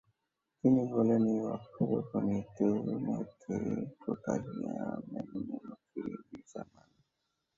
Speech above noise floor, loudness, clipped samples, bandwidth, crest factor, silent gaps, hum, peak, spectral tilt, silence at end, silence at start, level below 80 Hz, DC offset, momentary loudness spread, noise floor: 52 dB; -34 LUFS; under 0.1%; 7.6 kHz; 20 dB; none; none; -14 dBFS; -9 dB/octave; 0.95 s; 0.65 s; -66 dBFS; under 0.1%; 17 LU; -85 dBFS